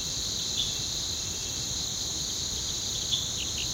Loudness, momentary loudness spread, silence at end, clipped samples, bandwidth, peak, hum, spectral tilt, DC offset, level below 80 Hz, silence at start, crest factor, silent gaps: -29 LUFS; 2 LU; 0 s; under 0.1%; 16 kHz; -14 dBFS; none; -1 dB/octave; under 0.1%; -46 dBFS; 0 s; 18 dB; none